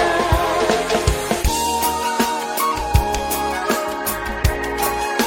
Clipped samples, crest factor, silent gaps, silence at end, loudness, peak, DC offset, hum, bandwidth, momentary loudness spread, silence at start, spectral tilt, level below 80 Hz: under 0.1%; 18 dB; none; 0 s; -19 LUFS; -2 dBFS; under 0.1%; none; 17 kHz; 3 LU; 0 s; -4 dB/octave; -28 dBFS